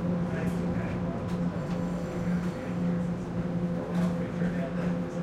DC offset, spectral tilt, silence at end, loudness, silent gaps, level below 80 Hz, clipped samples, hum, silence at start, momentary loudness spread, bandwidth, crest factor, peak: under 0.1%; -8.5 dB/octave; 0 s; -31 LUFS; none; -48 dBFS; under 0.1%; none; 0 s; 3 LU; 9.2 kHz; 12 dB; -18 dBFS